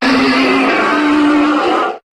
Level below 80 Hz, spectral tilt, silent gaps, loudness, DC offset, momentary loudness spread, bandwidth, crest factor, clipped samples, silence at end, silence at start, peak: -48 dBFS; -4 dB/octave; none; -12 LUFS; under 0.1%; 3 LU; 11.5 kHz; 12 dB; under 0.1%; 0.15 s; 0 s; 0 dBFS